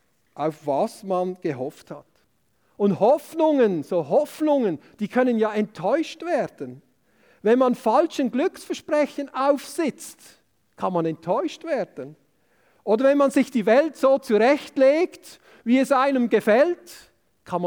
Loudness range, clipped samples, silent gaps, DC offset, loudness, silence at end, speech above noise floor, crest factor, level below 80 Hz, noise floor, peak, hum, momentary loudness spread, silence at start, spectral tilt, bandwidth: 6 LU; under 0.1%; none; under 0.1%; -22 LUFS; 0 s; 46 dB; 16 dB; -74 dBFS; -67 dBFS; -6 dBFS; none; 13 LU; 0.4 s; -6 dB/octave; 20 kHz